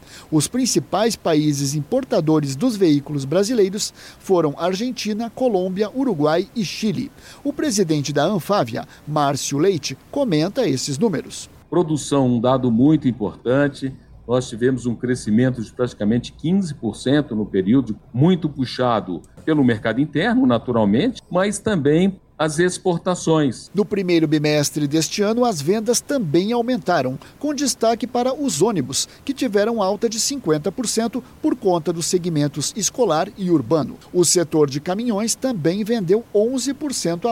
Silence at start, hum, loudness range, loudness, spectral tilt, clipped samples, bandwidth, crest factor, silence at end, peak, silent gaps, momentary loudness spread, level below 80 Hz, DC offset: 0.1 s; none; 2 LU; -20 LUFS; -5 dB/octave; under 0.1%; 16.5 kHz; 14 dB; 0 s; -6 dBFS; none; 7 LU; -52 dBFS; under 0.1%